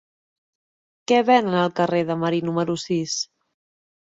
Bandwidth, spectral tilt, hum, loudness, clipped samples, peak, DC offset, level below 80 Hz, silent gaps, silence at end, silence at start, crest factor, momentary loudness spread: 7.8 kHz; -5 dB/octave; none; -21 LUFS; under 0.1%; -4 dBFS; under 0.1%; -66 dBFS; none; 0.95 s; 1.1 s; 20 dB; 10 LU